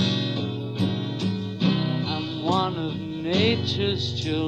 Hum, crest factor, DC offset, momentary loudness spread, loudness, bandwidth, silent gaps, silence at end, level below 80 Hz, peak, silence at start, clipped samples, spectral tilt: none; 18 dB; under 0.1%; 6 LU; -25 LUFS; 8.8 kHz; none; 0 s; -56 dBFS; -8 dBFS; 0 s; under 0.1%; -6.5 dB/octave